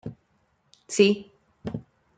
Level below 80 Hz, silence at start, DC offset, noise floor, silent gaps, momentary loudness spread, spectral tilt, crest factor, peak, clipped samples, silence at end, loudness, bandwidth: -62 dBFS; 0.05 s; under 0.1%; -68 dBFS; none; 19 LU; -4.5 dB/octave; 22 dB; -6 dBFS; under 0.1%; 0.35 s; -25 LUFS; 9.4 kHz